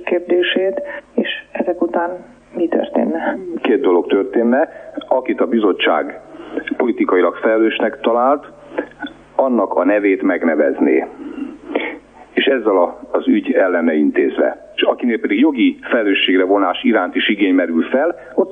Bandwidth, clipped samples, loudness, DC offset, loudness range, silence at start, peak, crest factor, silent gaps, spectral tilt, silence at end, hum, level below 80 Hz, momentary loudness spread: 3.8 kHz; under 0.1%; -16 LUFS; under 0.1%; 3 LU; 0 s; -2 dBFS; 14 dB; none; -6.5 dB/octave; 0 s; 50 Hz at -55 dBFS; -58 dBFS; 12 LU